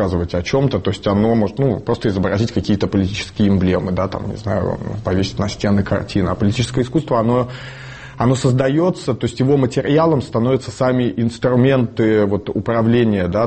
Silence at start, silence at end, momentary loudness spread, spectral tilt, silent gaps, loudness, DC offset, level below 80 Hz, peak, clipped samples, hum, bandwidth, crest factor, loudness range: 0 s; 0 s; 6 LU; -7 dB/octave; none; -17 LUFS; 0.3%; -40 dBFS; -4 dBFS; under 0.1%; none; 8.8 kHz; 14 dB; 3 LU